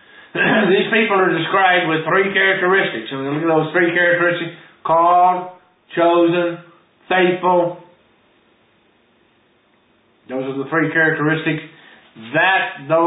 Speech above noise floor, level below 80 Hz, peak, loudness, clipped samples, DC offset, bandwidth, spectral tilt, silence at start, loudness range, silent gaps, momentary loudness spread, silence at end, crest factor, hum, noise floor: 41 dB; -68 dBFS; -2 dBFS; -16 LUFS; under 0.1%; under 0.1%; 4 kHz; -10.5 dB/octave; 0.35 s; 7 LU; none; 12 LU; 0 s; 16 dB; none; -57 dBFS